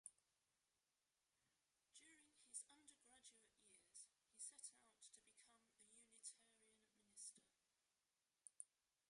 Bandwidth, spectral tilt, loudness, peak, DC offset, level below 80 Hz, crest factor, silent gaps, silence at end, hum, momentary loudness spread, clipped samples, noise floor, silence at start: 11.5 kHz; 1 dB/octave; -62 LUFS; -36 dBFS; under 0.1%; under -90 dBFS; 32 dB; none; 0.45 s; none; 12 LU; under 0.1%; under -90 dBFS; 0.05 s